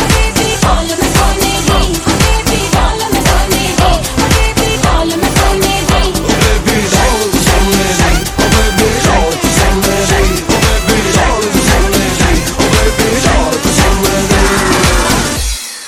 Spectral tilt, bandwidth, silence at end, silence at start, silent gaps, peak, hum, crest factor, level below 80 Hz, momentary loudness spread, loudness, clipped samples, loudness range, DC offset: -4 dB/octave; 18.5 kHz; 0 s; 0 s; none; 0 dBFS; none; 10 dB; -16 dBFS; 2 LU; -10 LUFS; 0.2%; 1 LU; under 0.1%